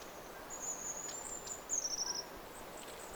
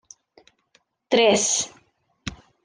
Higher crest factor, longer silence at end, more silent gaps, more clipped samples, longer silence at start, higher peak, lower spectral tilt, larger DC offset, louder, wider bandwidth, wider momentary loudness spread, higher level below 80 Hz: about the same, 18 dB vs 20 dB; second, 0 s vs 0.3 s; neither; neither; second, 0 s vs 1.1 s; second, -26 dBFS vs -6 dBFS; second, 0 dB/octave vs -2 dB/octave; neither; second, -41 LUFS vs -20 LUFS; first, over 20 kHz vs 10.5 kHz; second, 13 LU vs 19 LU; second, -64 dBFS vs -58 dBFS